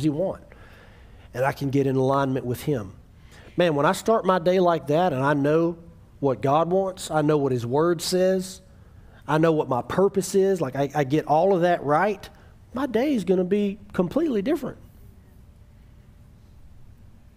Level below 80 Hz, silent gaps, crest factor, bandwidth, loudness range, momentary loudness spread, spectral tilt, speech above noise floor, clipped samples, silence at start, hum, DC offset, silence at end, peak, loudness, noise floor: -52 dBFS; none; 18 dB; 16 kHz; 5 LU; 9 LU; -6.5 dB/octave; 27 dB; under 0.1%; 0 s; none; under 0.1%; 0.5 s; -6 dBFS; -23 LUFS; -50 dBFS